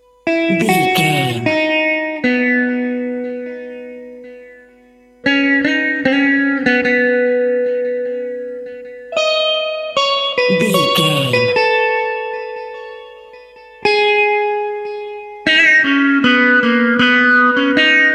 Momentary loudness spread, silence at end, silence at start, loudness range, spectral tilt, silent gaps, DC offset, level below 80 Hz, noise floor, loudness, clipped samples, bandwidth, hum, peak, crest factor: 17 LU; 0 s; 0.25 s; 6 LU; -4.5 dB/octave; none; under 0.1%; -58 dBFS; -47 dBFS; -14 LUFS; under 0.1%; 16 kHz; none; 0 dBFS; 16 dB